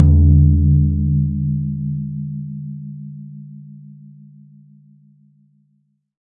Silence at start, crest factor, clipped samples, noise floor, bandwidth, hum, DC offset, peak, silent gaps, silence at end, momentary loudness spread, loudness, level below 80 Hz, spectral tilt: 0 s; 18 dB; under 0.1%; -64 dBFS; 1 kHz; none; under 0.1%; 0 dBFS; none; 2.35 s; 25 LU; -17 LUFS; -28 dBFS; -15.5 dB/octave